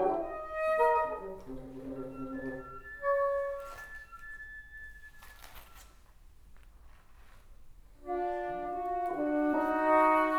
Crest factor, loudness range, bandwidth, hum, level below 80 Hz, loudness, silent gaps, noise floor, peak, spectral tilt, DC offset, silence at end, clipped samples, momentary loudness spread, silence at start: 20 dB; 19 LU; 17.5 kHz; none; -56 dBFS; -32 LUFS; none; -56 dBFS; -14 dBFS; -6 dB/octave; under 0.1%; 0 s; under 0.1%; 23 LU; 0 s